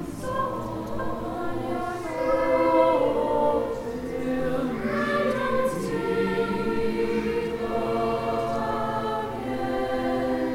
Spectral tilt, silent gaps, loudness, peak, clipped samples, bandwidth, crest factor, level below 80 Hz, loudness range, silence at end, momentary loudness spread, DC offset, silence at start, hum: -6.5 dB/octave; none; -26 LUFS; -8 dBFS; under 0.1%; 16.5 kHz; 16 dB; -46 dBFS; 3 LU; 0 s; 9 LU; under 0.1%; 0 s; none